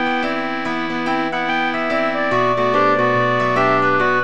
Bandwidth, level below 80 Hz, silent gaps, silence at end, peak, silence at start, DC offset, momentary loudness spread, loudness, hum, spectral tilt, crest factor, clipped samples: 9.4 kHz; -52 dBFS; none; 0 s; -4 dBFS; 0 s; 2%; 6 LU; -17 LUFS; none; -6 dB/octave; 14 dB; under 0.1%